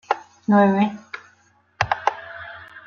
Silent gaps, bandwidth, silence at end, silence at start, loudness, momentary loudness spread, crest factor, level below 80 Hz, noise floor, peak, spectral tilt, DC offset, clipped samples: none; 6.8 kHz; 0.05 s; 0.1 s; -21 LUFS; 21 LU; 20 dB; -58 dBFS; -59 dBFS; -2 dBFS; -7 dB/octave; under 0.1%; under 0.1%